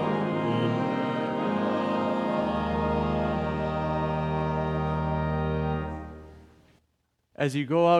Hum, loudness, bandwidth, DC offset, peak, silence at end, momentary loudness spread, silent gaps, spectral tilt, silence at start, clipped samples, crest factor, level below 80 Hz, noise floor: none; -28 LUFS; 11.5 kHz; under 0.1%; -10 dBFS; 0 s; 3 LU; none; -8 dB/octave; 0 s; under 0.1%; 18 dB; -46 dBFS; -73 dBFS